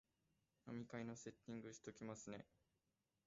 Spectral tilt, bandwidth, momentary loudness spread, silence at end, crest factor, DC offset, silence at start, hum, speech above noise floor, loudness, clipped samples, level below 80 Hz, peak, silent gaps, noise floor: -6 dB/octave; 7.6 kHz; 7 LU; 0.8 s; 20 dB; under 0.1%; 0.65 s; none; 35 dB; -55 LUFS; under 0.1%; -84 dBFS; -38 dBFS; none; -90 dBFS